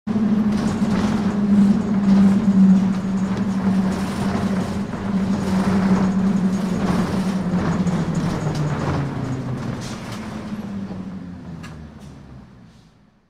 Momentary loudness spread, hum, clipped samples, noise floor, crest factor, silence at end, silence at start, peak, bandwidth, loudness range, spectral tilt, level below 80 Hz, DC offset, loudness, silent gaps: 16 LU; none; under 0.1%; -52 dBFS; 14 dB; 0.85 s; 0.05 s; -6 dBFS; 10.5 kHz; 13 LU; -7.5 dB/octave; -42 dBFS; under 0.1%; -20 LUFS; none